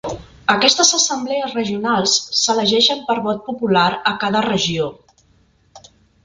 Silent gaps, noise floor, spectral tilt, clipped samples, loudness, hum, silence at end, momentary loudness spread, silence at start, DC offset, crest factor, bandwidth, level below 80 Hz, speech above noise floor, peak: none; -56 dBFS; -2 dB/octave; under 0.1%; -16 LUFS; none; 0.45 s; 10 LU; 0.05 s; under 0.1%; 18 dB; 11 kHz; -52 dBFS; 39 dB; 0 dBFS